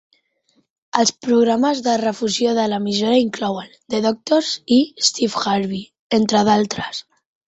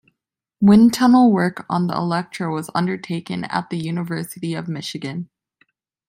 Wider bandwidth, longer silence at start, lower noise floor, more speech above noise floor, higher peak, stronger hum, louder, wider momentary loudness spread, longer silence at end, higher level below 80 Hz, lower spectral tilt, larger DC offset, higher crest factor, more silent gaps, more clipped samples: second, 8.4 kHz vs 16 kHz; first, 0.95 s vs 0.6 s; second, -64 dBFS vs -79 dBFS; second, 46 dB vs 61 dB; about the same, -2 dBFS vs -4 dBFS; neither; about the same, -18 LUFS vs -19 LUFS; second, 9 LU vs 15 LU; second, 0.45 s vs 0.85 s; about the same, -60 dBFS vs -58 dBFS; second, -4 dB/octave vs -6.5 dB/octave; neither; about the same, 18 dB vs 16 dB; first, 5.99-6.10 s vs none; neither